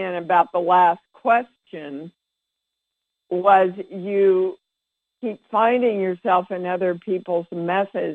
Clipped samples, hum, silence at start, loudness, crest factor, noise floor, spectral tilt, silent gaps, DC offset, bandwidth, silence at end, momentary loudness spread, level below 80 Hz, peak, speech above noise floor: under 0.1%; none; 0 s; -20 LUFS; 18 dB; -82 dBFS; -8 dB/octave; none; under 0.1%; 4.3 kHz; 0 s; 15 LU; -74 dBFS; -2 dBFS; 62 dB